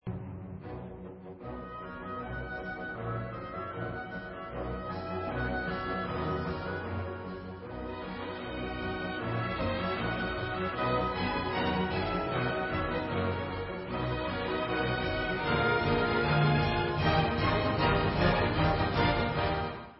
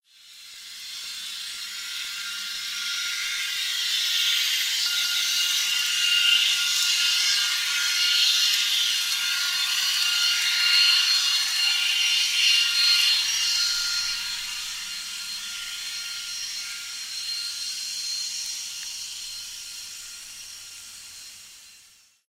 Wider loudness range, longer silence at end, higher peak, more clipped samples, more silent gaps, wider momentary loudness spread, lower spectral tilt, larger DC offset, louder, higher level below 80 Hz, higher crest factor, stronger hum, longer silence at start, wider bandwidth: about the same, 11 LU vs 12 LU; second, 0 s vs 0.5 s; second, -12 dBFS vs -8 dBFS; neither; neither; second, 14 LU vs 17 LU; first, -10 dB/octave vs 5 dB/octave; neither; second, -32 LUFS vs -22 LUFS; first, -44 dBFS vs -66 dBFS; about the same, 18 dB vs 18 dB; neither; second, 0.05 s vs 0.25 s; second, 5.8 kHz vs 16 kHz